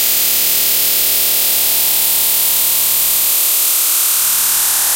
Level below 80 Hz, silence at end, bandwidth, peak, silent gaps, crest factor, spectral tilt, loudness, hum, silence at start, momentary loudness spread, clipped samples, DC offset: -50 dBFS; 0 s; 16.5 kHz; -2 dBFS; none; 12 dB; 2 dB/octave; -10 LUFS; none; 0 s; 0 LU; under 0.1%; under 0.1%